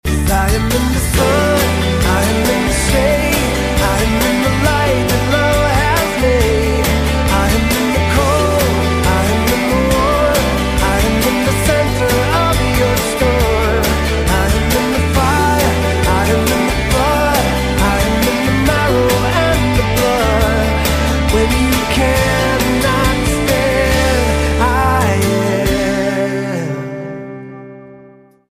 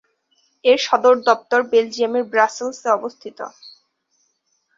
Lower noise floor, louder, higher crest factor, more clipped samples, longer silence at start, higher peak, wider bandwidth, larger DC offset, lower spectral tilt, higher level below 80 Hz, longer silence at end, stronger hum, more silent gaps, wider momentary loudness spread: second, -42 dBFS vs -67 dBFS; first, -14 LUFS vs -18 LUFS; second, 12 dB vs 18 dB; neither; second, 0.05 s vs 0.65 s; about the same, 0 dBFS vs 0 dBFS; first, 15.5 kHz vs 7.6 kHz; neither; first, -5 dB/octave vs -2.5 dB/octave; first, -20 dBFS vs -72 dBFS; second, 0.55 s vs 1.1 s; neither; neither; second, 2 LU vs 18 LU